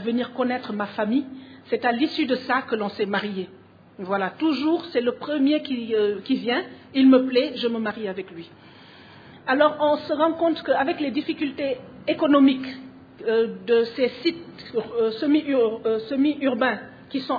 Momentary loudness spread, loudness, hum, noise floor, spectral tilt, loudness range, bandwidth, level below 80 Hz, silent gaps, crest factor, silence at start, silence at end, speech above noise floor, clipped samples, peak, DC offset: 12 LU; -23 LUFS; none; -47 dBFS; -7.5 dB/octave; 3 LU; 5 kHz; -68 dBFS; none; 18 dB; 0 s; 0 s; 24 dB; under 0.1%; -4 dBFS; under 0.1%